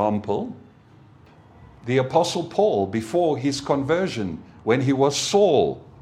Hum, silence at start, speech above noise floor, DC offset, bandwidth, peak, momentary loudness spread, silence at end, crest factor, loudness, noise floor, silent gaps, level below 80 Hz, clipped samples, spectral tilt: none; 0 s; 29 dB; under 0.1%; 14 kHz; -4 dBFS; 10 LU; 0.2 s; 18 dB; -22 LUFS; -50 dBFS; none; -56 dBFS; under 0.1%; -5 dB/octave